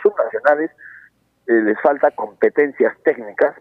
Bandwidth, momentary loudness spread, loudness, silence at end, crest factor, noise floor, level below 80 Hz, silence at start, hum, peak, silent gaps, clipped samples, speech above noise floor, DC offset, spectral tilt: 5 kHz; 5 LU; -18 LUFS; 0.1 s; 16 dB; -50 dBFS; -70 dBFS; 0 s; none; -2 dBFS; none; under 0.1%; 33 dB; under 0.1%; -8 dB/octave